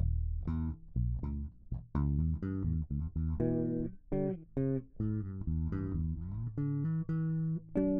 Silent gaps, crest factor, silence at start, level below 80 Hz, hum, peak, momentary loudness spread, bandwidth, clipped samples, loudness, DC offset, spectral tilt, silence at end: none; 14 dB; 0 s; -40 dBFS; none; -20 dBFS; 6 LU; 2.6 kHz; under 0.1%; -36 LUFS; under 0.1%; -12.5 dB/octave; 0 s